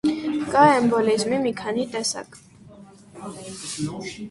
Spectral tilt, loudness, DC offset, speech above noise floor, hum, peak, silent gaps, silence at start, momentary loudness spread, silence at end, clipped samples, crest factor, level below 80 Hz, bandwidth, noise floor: -4.5 dB/octave; -22 LUFS; under 0.1%; 24 dB; none; -2 dBFS; none; 0.05 s; 20 LU; 0 s; under 0.1%; 20 dB; -58 dBFS; 11.5 kHz; -46 dBFS